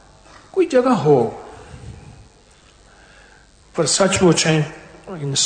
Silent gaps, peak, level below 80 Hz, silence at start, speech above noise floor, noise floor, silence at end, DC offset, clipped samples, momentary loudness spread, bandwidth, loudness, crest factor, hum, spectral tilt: none; -4 dBFS; -48 dBFS; 0.55 s; 33 dB; -50 dBFS; 0 s; under 0.1%; under 0.1%; 24 LU; 9.4 kHz; -17 LUFS; 16 dB; none; -4 dB/octave